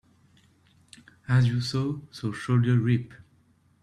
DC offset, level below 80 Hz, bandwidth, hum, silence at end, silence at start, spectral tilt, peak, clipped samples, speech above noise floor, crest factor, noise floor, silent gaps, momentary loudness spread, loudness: under 0.1%; -60 dBFS; 10.5 kHz; none; 0.65 s; 1.3 s; -7 dB/octave; -12 dBFS; under 0.1%; 38 dB; 16 dB; -63 dBFS; none; 11 LU; -26 LUFS